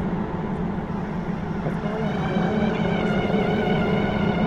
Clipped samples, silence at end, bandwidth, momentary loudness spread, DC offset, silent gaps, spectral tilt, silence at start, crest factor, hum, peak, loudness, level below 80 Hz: under 0.1%; 0 s; 7.8 kHz; 6 LU; 0.1%; none; -8 dB/octave; 0 s; 14 dB; none; -8 dBFS; -24 LUFS; -40 dBFS